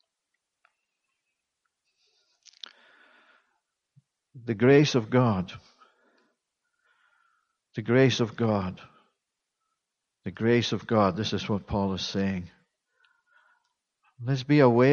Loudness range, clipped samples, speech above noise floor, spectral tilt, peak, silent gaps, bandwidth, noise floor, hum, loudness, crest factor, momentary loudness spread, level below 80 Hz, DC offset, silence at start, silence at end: 4 LU; under 0.1%; 60 dB; -6.5 dB/octave; -6 dBFS; none; 7 kHz; -84 dBFS; none; -25 LUFS; 22 dB; 23 LU; -60 dBFS; under 0.1%; 4.35 s; 0 s